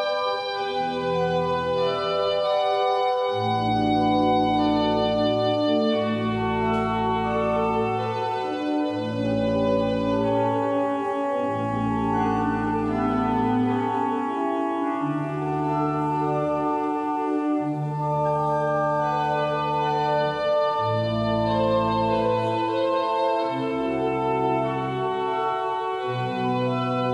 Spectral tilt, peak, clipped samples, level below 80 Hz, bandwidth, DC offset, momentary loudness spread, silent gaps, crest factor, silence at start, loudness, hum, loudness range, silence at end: -7.5 dB/octave; -10 dBFS; under 0.1%; -48 dBFS; 10 kHz; under 0.1%; 4 LU; none; 14 dB; 0 s; -24 LUFS; none; 3 LU; 0 s